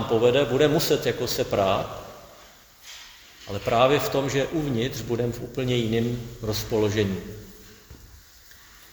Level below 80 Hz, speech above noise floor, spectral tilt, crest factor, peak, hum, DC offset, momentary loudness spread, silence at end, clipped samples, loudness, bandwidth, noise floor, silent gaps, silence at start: -48 dBFS; 27 dB; -5 dB/octave; 20 dB; -6 dBFS; none; under 0.1%; 22 LU; 0.75 s; under 0.1%; -24 LUFS; over 20 kHz; -50 dBFS; none; 0 s